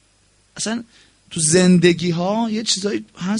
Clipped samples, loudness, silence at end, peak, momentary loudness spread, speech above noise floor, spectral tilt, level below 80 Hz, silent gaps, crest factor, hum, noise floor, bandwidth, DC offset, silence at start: under 0.1%; -18 LUFS; 0 s; -2 dBFS; 13 LU; 40 dB; -4.5 dB/octave; -56 dBFS; none; 18 dB; none; -58 dBFS; 11 kHz; under 0.1%; 0.55 s